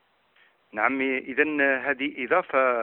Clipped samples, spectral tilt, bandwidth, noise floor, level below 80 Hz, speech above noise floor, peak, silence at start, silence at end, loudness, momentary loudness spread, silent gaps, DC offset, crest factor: under 0.1%; -8.5 dB/octave; 4.1 kHz; -62 dBFS; -72 dBFS; 38 dB; -6 dBFS; 0.75 s; 0 s; -24 LUFS; 6 LU; none; under 0.1%; 20 dB